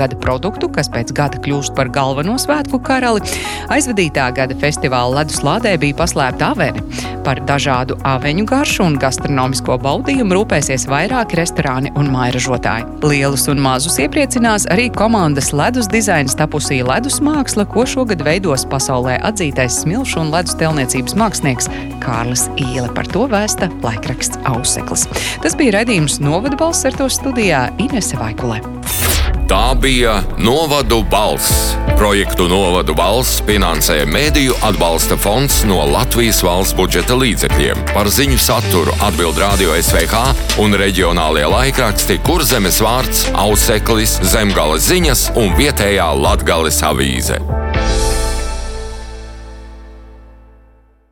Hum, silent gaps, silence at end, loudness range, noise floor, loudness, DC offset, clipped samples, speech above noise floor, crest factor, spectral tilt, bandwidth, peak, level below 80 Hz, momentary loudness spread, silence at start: none; none; 0.8 s; 4 LU; -47 dBFS; -14 LUFS; under 0.1%; under 0.1%; 34 dB; 14 dB; -4 dB/octave; 19 kHz; 0 dBFS; -22 dBFS; 6 LU; 0 s